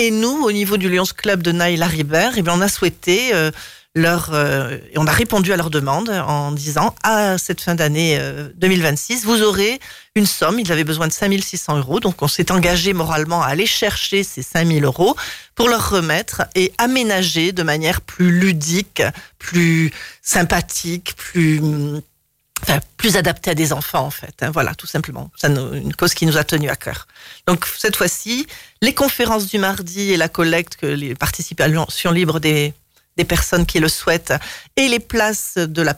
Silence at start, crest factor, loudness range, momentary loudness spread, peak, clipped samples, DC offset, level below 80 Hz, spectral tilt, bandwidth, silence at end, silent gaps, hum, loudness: 0 s; 14 dB; 2 LU; 7 LU; -4 dBFS; under 0.1%; 0.2%; -38 dBFS; -4 dB/octave; 16.5 kHz; 0 s; none; none; -17 LUFS